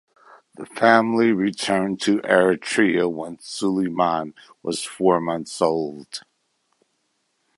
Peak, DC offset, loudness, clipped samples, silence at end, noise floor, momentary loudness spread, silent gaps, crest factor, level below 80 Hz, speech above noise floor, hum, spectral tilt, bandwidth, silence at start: -2 dBFS; under 0.1%; -21 LUFS; under 0.1%; 1.4 s; -71 dBFS; 17 LU; none; 20 dB; -64 dBFS; 50 dB; none; -4.5 dB/octave; 11.5 kHz; 0.6 s